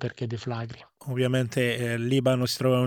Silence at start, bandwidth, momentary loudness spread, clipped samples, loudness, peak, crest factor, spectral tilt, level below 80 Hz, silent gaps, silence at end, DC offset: 0 s; 18 kHz; 11 LU; under 0.1%; -27 LUFS; -10 dBFS; 16 dB; -6 dB/octave; -62 dBFS; none; 0 s; under 0.1%